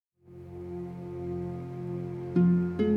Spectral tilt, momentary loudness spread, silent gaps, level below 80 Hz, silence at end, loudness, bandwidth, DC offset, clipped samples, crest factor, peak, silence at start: -10.5 dB/octave; 17 LU; none; -58 dBFS; 0 s; -31 LUFS; 4.1 kHz; under 0.1%; under 0.1%; 16 dB; -14 dBFS; 0.25 s